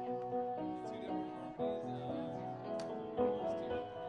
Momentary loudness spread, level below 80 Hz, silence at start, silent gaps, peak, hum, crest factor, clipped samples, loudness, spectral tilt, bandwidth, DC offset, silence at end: 6 LU; -70 dBFS; 0 s; none; -22 dBFS; none; 18 dB; under 0.1%; -41 LUFS; -7.5 dB/octave; 10.5 kHz; under 0.1%; 0 s